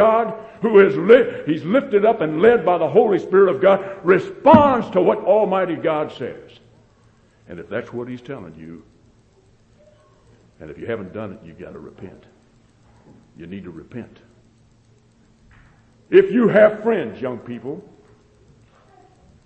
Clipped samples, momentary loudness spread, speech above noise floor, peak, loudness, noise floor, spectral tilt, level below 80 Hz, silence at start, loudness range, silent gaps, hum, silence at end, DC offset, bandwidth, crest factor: under 0.1%; 24 LU; 37 dB; 0 dBFS; -17 LUFS; -55 dBFS; -8 dB/octave; -54 dBFS; 0 s; 20 LU; none; none; 1.65 s; under 0.1%; 6.8 kHz; 20 dB